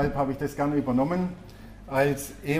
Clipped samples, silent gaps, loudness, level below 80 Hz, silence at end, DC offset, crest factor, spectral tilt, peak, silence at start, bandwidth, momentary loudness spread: under 0.1%; none; -27 LUFS; -46 dBFS; 0 s; under 0.1%; 16 dB; -6.5 dB/octave; -12 dBFS; 0 s; 15.5 kHz; 18 LU